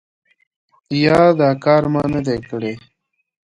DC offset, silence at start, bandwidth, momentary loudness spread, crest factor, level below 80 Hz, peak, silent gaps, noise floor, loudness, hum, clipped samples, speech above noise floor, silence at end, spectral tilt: under 0.1%; 0.9 s; 11 kHz; 13 LU; 18 dB; -50 dBFS; 0 dBFS; none; -71 dBFS; -16 LUFS; none; under 0.1%; 56 dB; 0.65 s; -7.5 dB/octave